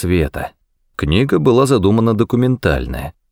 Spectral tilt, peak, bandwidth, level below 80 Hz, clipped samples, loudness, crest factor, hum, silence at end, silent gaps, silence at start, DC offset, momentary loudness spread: -7 dB/octave; -2 dBFS; 17 kHz; -30 dBFS; under 0.1%; -15 LUFS; 14 dB; none; 0.2 s; none; 0 s; under 0.1%; 15 LU